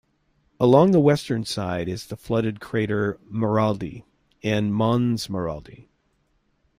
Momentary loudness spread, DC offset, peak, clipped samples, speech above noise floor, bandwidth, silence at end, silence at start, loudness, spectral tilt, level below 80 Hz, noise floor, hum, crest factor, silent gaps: 14 LU; under 0.1%; -4 dBFS; under 0.1%; 46 dB; 15.5 kHz; 0.95 s; 0.6 s; -23 LUFS; -7 dB/octave; -54 dBFS; -68 dBFS; none; 20 dB; none